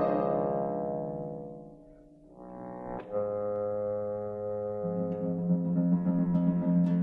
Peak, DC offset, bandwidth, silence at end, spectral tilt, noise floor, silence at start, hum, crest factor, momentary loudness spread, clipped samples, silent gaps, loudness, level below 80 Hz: -16 dBFS; under 0.1%; 2.8 kHz; 0 s; -12 dB/octave; -54 dBFS; 0 s; none; 16 dB; 16 LU; under 0.1%; none; -31 LUFS; -60 dBFS